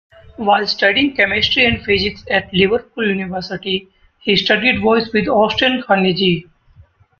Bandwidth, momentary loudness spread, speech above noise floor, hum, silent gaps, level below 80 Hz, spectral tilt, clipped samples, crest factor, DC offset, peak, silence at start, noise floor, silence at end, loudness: 7 kHz; 9 LU; 33 dB; none; none; -44 dBFS; -6 dB/octave; under 0.1%; 16 dB; under 0.1%; 0 dBFS; 0.4 s; -48 dBFS; 0.75 s; -15 LUFS